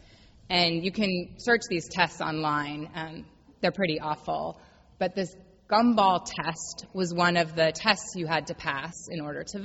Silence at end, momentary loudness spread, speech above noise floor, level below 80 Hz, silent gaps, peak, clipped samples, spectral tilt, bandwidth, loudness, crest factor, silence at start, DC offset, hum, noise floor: 0 s; 13 LU; 26 dB; -58 dBFS; none; -4 dBFS; under 0.1%; -4 dB/octave; 8.2 kHz; -27 LUFS; 24 dB; 0.5 s; under 0.1%; none; -54 dBFS